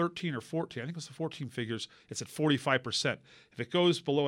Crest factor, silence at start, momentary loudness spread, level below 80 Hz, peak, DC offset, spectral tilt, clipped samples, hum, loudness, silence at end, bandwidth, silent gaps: 20 dB; 0 s; 13 LU; -74 dBFS; -12 dBFS; under 0.1%; -4.5 dB/octave; under 0.1%; none; -33 LUFS; 0 s; 16 kHz; none